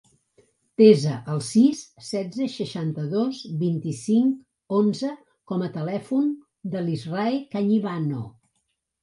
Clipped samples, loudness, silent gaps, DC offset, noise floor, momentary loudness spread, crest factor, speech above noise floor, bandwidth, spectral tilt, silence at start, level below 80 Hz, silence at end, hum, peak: under 0.1%; -24 LUFS; none; under 0.1%; -75 dBFS; 13 LU; 20 dB; 53 dB; 11.5 kHz; -7 dB/octave; 0.8 s; -68 dBFS; 0.7 s; none; -4 dBFS